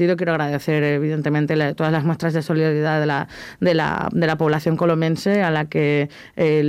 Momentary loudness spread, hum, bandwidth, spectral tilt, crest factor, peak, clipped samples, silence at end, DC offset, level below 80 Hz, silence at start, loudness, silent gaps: 4 LU; none; 14 kHz; -7.5 dB/octave; 12 dB; -6 dBFS; under 0.1%; 0 s; under 0.1%; -54 dBFS; 0 s; -20 LUFS; none